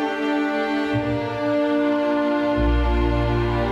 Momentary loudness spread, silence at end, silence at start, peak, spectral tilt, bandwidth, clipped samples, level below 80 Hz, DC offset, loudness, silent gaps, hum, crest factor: 3 LU; 0 s; 0 s; -10 dBFS; -7.5 dB/octave; 8 kHz; under 0.1%; -28 dBFS; under 0.1%; -21 LUFS; none; none; 10 dB